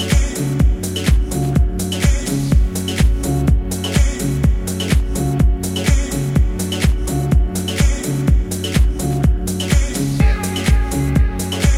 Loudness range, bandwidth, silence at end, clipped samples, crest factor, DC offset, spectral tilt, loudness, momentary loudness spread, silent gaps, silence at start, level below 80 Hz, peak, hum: 1 LU; 16 kHz; 0 s; under 0.1%; 12 dB; under 0.1%; -5.5 dB/octave; -18 LUFS; 3 LU; none; 0 s; -18 dBFS; -2 dBFS; none